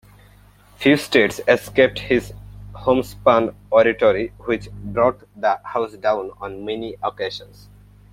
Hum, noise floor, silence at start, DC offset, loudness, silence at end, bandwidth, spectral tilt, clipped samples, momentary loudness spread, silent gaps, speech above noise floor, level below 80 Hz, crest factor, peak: 50 Hz at -40 dBFS; -49 dBFS; 0.8 s; under 0.1%; -20 LUFS; 0.65 s; 16 kHz; -5.5 dB/octave; under 0.1%; 12 LU; none; 30 dB; -46 dBFS; 20 dB; -2 dBFS